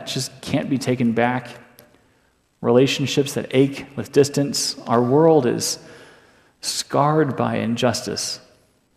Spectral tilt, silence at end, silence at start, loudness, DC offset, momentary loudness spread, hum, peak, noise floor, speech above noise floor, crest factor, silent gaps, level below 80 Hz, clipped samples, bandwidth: -5 dB/octave; 0.6 s; 0 s; -20 LUFS; under 0.1%; 11 LU; none; -2 dBFS; -62 dBFS; 42 dB; 18 dB; none; -62 dBFS; under 0.1%; 15.5 kHz